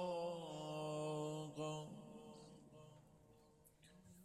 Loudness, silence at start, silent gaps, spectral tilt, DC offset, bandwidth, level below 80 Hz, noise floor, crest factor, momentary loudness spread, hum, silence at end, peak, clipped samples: -48 LUFS; 0 s; none; -5.5 dB/octave; under 0.1%; 14 kHz; -80 dBFS; -70 dBFS; 16 dB; 24 LU; none; 0 s; -34 dBFS; under 0.1%